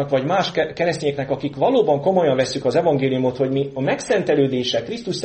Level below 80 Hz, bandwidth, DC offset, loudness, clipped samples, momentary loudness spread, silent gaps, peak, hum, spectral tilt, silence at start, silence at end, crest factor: -56 dBFS; 8.8 kHz; under 0.1%; -20 LUFS; under 0.1%; 6 LU; none; -4 dBFS; none; -5.5 dB/octave; 0 s; 0 s; 14 dB